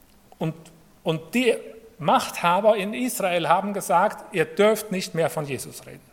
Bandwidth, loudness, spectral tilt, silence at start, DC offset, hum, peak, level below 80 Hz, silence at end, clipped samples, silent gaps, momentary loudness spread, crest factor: 17.5 kHz; -23 LUFS; -4.5 dB/octave; 0.4 s; under 0.1%; none; -4 dBFS; -64 dBFS; 0.15 s; under 0.1%; none; 12 LU; 20 dB